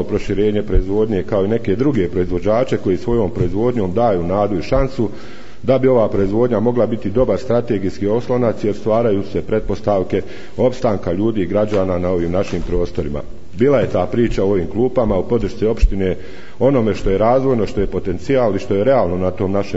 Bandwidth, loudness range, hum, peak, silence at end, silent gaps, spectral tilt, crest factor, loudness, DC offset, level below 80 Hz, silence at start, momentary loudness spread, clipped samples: 8 kHz; 2 LU; none; 0 dBFS; 0 s; none; -8 dB/octave; 16 dB; -17 LUFS; 5%; -28 dBFS; 0 s; 6 LU; under 0.1%